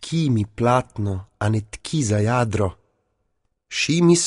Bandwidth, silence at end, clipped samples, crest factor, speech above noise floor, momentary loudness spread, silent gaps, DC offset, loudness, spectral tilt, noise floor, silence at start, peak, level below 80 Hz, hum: 11 kHz; 0 s; under 0.1%; 16 dB; 51 dB; 8 LU; none; under 0.1%; -22 LUFS; -5 dB/octave; -71 dBFS; 0 s; -4 dBFS; -48 dBFS; none